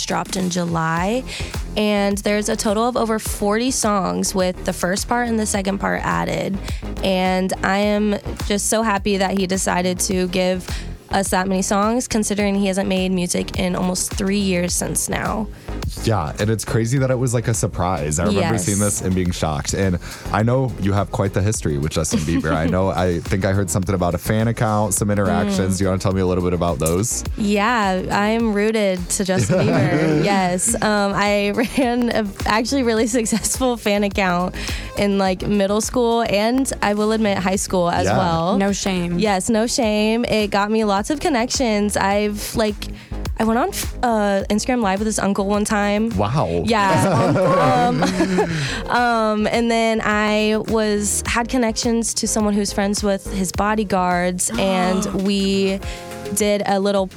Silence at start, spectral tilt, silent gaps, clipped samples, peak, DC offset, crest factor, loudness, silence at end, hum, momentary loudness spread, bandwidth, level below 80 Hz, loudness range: 0 s; -4.5 dB/octave; none; under 0.1%; -2 dBFS; under 0.1%; 18 dB; -19 LUFS; 0 s; none; 4 LU; 18 kHz; -36 dBFS; 3 LU